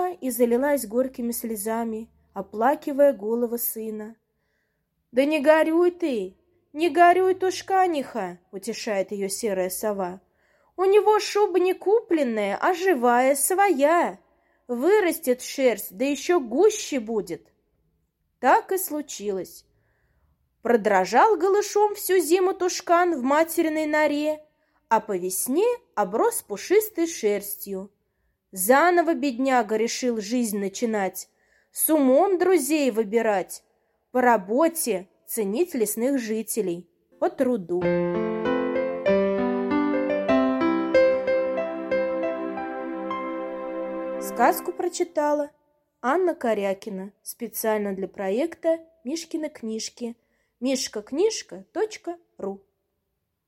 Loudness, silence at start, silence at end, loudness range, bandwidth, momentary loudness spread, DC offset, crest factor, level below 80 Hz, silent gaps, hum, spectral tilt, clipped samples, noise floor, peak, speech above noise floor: -23 LUFS; 0 s; 0.9 s; 6 LU; 16.5 kHz; 13 LU; under 0.1%; 20 dB; -64 dBFS; none; none; -4 dB/octave; under 0.1%; -78 dBFS; -4 dBFS; 55 dB